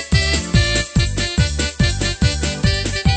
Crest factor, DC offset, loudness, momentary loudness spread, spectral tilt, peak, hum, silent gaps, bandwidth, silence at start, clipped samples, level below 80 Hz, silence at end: 16 dB; under 0.1%; -18 LUFS; 3 LU; -4 dB/octave; -2 dBFS; none; none; 9.2 kHz; 0 s; under 0.1%; -22 dBFS; 0 s